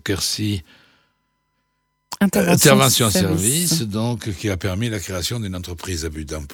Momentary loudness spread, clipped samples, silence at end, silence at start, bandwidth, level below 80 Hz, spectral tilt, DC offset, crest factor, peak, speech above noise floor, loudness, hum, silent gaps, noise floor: 15 LU; under 0.1%; 0 s; 0.05 s; over 20 kHz; -42 dBFS; -4 dB/octave; under 0.1%; 20 dB; 0 dBFS; 51 dB; -19 LUFS; none; none; -71 dBFS